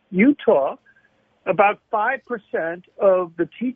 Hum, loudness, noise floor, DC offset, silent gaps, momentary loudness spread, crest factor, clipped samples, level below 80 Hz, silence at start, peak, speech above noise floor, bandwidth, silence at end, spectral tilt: none; -20 LUFS; -61 dBFS; under 0.1%; none; 10 LU; 18 dB; under 0.1%; -64 dBFS; 0.1 s; -4 dBFS; 41 dB; 3.7 kHz; 0.05 s; -10 dB/octave